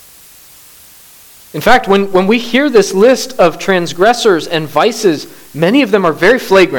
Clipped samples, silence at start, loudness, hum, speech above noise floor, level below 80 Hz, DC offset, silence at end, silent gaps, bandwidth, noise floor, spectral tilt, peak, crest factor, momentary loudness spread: 0.1%; 1.55 s; -11 LUFS; none; 29 dB; -42 dBFS; under 0.1%; 0 s; none; 19.5 kHz; -39 dBFS; -4.5 dB/octave; 0 dBFS; 12 dB; 6 LU